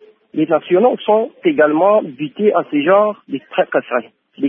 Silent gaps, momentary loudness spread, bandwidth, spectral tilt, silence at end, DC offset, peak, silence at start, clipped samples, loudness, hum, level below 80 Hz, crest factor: none; 10 LU; 3.7 kHz; -9.5 dB/octave; 0 s; under 0.1%; -2 dBFS; 0.35 s; under 0.1%; -15 LUFS; none; -70 dBFS; 14 dB